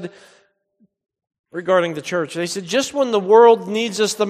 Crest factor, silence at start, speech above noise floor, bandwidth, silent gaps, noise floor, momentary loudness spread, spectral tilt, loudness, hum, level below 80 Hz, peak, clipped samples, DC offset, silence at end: 18 dB; 0 s; 45 dB; 15 kHz; 1.39-1.44 s; -62 dBFS; 15 LU; -4 dB/octave; -17 LUFS; none; -68 dBFS; 0 dBFS; under 0.1%; under 0.1%; 0 s